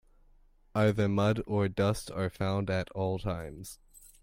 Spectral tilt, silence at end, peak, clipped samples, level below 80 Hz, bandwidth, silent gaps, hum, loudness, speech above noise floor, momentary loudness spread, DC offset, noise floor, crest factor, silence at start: -6.5 dB/octave; 0.45 s; -14 dBFS; under 0.1%; -52 dBFS; 16 kHz; none; none; -31 LUFS; 31 dB; 14 LU; under 0.1%; -61 dBFS; 16 dB; 0.75 s